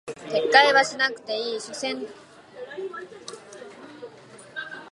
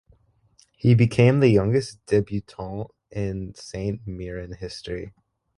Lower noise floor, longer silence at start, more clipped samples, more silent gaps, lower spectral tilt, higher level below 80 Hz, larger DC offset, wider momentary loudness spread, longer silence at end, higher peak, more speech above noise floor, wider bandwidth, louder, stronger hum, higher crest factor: second, -47 dBFS vs -60 dBFS; second, 0.05 s vs 0.85 s; neither; neither; second, -1.5 dB/octave vs -7.5 dB/octave; second, -76 dBFS vs -46 dBFS; neither; first, 26 LU vs 17 LU; second, 0 s vs 0.5 s; about the same, -2 dBFS vs -4 dBFS; second, 24 dB vs 38 dB; about the same, 11.5 kHz vs 11 kHz; about the same, -22 LUFS vs -23 LUFS; neither; about the same, 24 dB vs 20 dB